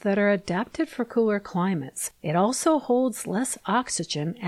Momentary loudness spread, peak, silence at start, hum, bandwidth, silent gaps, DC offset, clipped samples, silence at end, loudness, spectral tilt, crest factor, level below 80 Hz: 7 LU; -10 dBFS; 0.05 s; none; 14 kHz; none; under 0.1%; under 0.1%; 0 s; -25 LUFS; -4.5 dB/octave; 14 dB; -62 dBFS